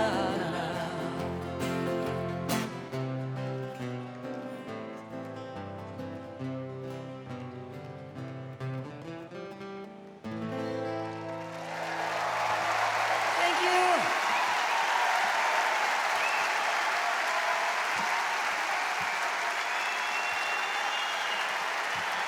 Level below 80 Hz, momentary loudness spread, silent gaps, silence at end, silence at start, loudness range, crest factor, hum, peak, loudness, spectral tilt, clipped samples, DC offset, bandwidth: -66 dBFS; 15 LU; none; 0 s; 0 s; 14 LU; 18 dB; none; -14 dBFS; -30 LUFS; -3.5 dB/octave; under 0.1%; under 0.1%; over 20 kHz